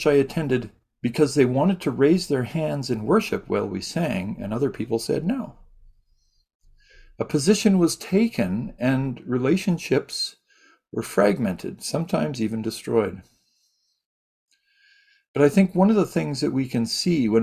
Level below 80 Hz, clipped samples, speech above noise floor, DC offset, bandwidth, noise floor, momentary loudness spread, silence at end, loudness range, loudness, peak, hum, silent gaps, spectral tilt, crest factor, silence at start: -54 dBFS; under 0.1%; 47 dB; under 0.1%; 15.5 kHz; -69 dBFS; 10 LU; 0 s; 6 LU; -23 LUFS; -4 dBFS; none; 6.55-6.59 s, 14.06-14.47 s, 15.28-15.34 s; -6 dB/octave; 18 dB; 0 s